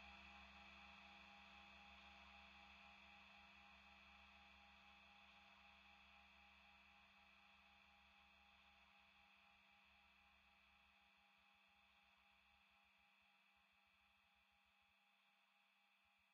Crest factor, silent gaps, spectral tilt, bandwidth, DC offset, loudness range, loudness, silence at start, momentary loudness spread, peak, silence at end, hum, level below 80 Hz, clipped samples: 18 dB; none; -1 dB/octave; 7 kHz; under 0.1%; 6 LU; -65 LUFS; 0 s; 6 LU; -52 dBFS; 0 s; none; -82 dBFS; under 0.1%